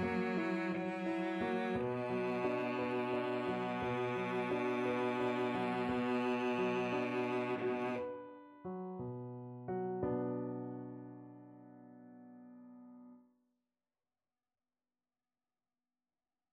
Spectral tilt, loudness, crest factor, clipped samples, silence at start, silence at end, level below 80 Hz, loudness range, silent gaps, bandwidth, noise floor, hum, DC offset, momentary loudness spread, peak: -7 dB/octave; -38 LUFS; 14 dB; under 0.1%; 0 s; 3.35 s; -72 dBFS; 12 LU; none; 11 kHz; under -90 dBFS; none; under 0.1%; 21 LU; -24 dBFS